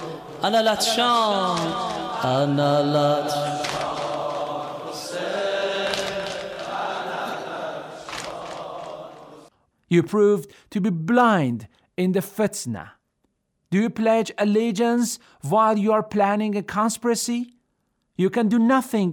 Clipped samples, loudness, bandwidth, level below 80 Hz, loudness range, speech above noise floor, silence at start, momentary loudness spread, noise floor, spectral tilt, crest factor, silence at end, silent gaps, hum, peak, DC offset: under 0.1%; -23 LUFS; over 20 kHz; -62 dBFS; 7 LU; 51 dB; 0 s; 14 LU; -72 dBFS; -5 dB/octave; 16 dB; 0 s; none; none; -6 dBFS; under 0.1%